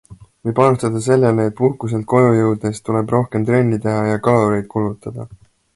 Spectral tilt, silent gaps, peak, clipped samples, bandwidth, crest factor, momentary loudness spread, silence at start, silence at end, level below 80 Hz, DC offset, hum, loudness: -8 dB/octave; none; 0 dBFS; under 0.1%; 11.5 kHz; 16 dB; 10 LU; 0.1 s; 0.4 s; -50 dBFS; under 0.1%; none; -17 LUFS